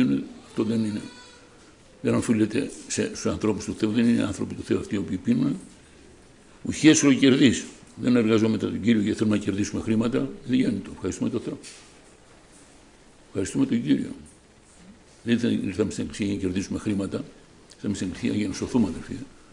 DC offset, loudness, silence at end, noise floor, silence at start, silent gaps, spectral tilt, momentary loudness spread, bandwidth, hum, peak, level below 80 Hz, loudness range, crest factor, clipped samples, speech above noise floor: under 0.1%; -25 LUFS; 0.25 s; -53 dBFS; 0 s; none; -5 dB/octave; 15 LU; 11 kHz; none; -6 dBFS; -54 dBFS; 9 LU; 20 dB; under 0.1%; 29 dB